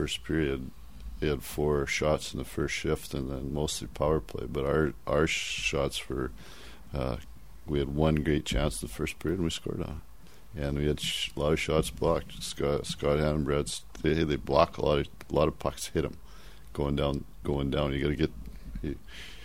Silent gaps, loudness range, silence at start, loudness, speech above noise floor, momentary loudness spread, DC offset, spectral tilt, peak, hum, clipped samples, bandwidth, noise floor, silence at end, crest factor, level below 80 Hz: none; 3 LU; 0 s; -30 LUFS; 20 dB; 12 LU; 0.5%; -5 dB/octave; -6 dBFS; none; under 0.1%; 16 kHz; -50 dBFS; 0 s; 24 dB; -42 dBFS